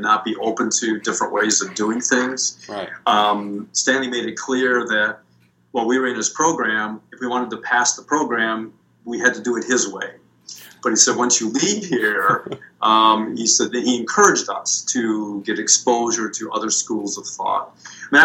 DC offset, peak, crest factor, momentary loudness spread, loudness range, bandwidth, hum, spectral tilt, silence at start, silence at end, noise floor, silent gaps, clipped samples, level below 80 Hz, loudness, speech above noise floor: under 0.1%; 0 dBFS; 20 dB; 12 LU; 4 LU; 16.5 kHz; none; -1.5 dB/octave; 0 s; 0 s; -57 dBFS; none; under 0.1%; -70 dBFS; -19 LUFS; 38 dB